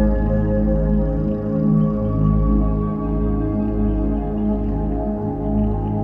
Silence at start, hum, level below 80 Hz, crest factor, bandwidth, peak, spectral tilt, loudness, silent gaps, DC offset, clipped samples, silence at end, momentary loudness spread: 0 s; none; -24 dBFS; 12 dB; 3 kHz; -6 dBFS; -12.5 dB/octave; -20 LUFS; none; under 0.1%; under 0.1%; 0 s; 4 LU